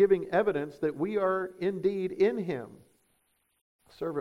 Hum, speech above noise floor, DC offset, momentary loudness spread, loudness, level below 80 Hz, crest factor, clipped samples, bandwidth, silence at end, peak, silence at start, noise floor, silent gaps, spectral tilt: none; 45 dB; under 0.1%; 10 LU; -30 LUFS; -66 dBFS; 18 dB; under 0.1%; 10.5 kHz; 0 s; -12 dBFS; 0 s; -73 dBFS; 3.61-3.79 s; -8 dB/octave